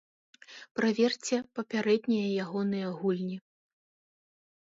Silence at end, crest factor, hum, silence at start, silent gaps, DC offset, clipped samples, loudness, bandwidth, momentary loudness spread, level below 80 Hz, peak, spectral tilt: 1.25 s; 18 dB; none; 0.5 s; 0.71-0.75 s; under 0.1%; under 0.1%; -30 LUFS; 7.8 kHz; 12 LU; -78 dBFS; -14 dBFS; -5.5 dB/octave